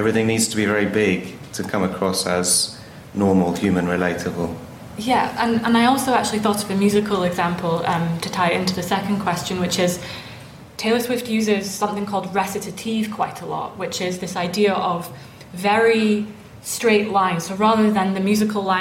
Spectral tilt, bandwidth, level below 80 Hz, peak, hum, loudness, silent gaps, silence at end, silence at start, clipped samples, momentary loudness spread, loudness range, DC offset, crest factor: -4.5 dB/octave; 16.5 kHz; -52 dBFS; -6 dBFS; none; -20 LUFS; none; 0 s; 0 s; under 0.1%; 11 LU; 4 LU; under 0.1%; 14 dB